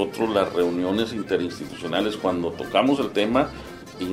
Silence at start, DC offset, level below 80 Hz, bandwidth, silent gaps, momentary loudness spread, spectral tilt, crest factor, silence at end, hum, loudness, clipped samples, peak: 0 s; under 0.1%; -52 dBFS; 15.5 kHz; none; 10 LU; -5.5 dB/octave; 18 dB; 0 s; none; -24 LUFS; under 0.1%; -6 dBFS